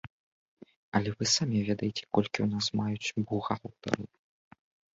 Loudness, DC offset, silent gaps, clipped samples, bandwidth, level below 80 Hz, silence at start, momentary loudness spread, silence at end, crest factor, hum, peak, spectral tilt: -31 LUFS; under 0.1%; 0.10-0.57 s, 0.76-0.92 s; under 0.1%; 8 kHz; -62 dBFS; 0.05 s; 8 LU; 0.9 s; 22 dB; none; -10 dBFS; -4.5 dB/octave